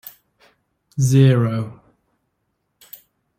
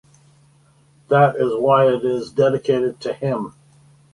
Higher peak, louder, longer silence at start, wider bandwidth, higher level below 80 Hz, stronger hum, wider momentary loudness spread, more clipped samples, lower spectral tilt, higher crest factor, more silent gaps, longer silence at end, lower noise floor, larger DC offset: about the same, -2 dBFS vs -2 dBFS; about the same, -17 LUFS vs -18 LUFS; second, 0.95 s vs 1.1 s; first, 16 kHz vs 11.5 kHz; first, -54 dBFS vs -60 dBFS; neither; first, 19 LU vs 9 LU; neither; about the same, -7 dB/octave vs -7.5 dB/octave; about the same, 18 dB vs 18 dB; neither; first, 1.65 s vs 0.65 s; first, -72 dBFS vs -55 dBFS; neither